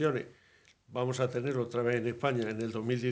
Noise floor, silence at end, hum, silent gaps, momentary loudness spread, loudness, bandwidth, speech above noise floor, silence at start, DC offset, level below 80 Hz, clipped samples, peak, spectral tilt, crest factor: -64 dBFS; 0 s; none; none; 6 LU; -33 LUFS; 9.4 kHz; 32 dB; 0 s; under 0.1%; -72 dBFS; under 0.1%; -14 dBFS; -6.5 dB/octave; 18 dB